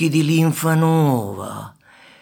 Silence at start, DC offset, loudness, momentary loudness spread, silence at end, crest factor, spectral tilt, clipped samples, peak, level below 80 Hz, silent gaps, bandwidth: 0 s; under 0.1%; -17 LUFS; 17 LU; 0.5 s; 14 dB; -6.5 dB/octave; under 0.1%; -4 dBFS; -64 dBFS; none; 18 kHz